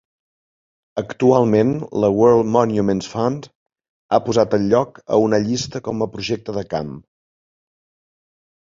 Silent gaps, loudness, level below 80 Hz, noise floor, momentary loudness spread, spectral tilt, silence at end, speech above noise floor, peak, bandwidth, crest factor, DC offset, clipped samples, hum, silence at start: 3.55-3.66 s, 3.89-4.09 s; -18 LUFS; -52 dBFS; under -90 dBFS; 12 LU; -6.5 dB/octave; 1.65 s; over 72 dB; -2 dBFS; 7.6 kHz; 18 dB; under 0.1%; under 0.1%; none; 0.95 s